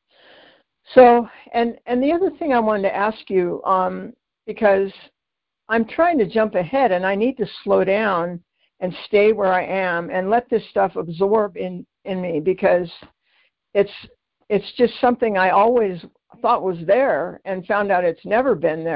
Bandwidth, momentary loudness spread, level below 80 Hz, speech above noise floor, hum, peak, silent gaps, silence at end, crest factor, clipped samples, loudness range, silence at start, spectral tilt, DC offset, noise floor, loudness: 5.4 kHz; 12 LU; -56 dBFS; 65 dB; none; -2 dBFS; none; 0 s; 18 dB; under 0.1%; 4 LU; 0.9 s; -10.5 dB/octave; under 0.1%; -83 dBFS; -19 LUFS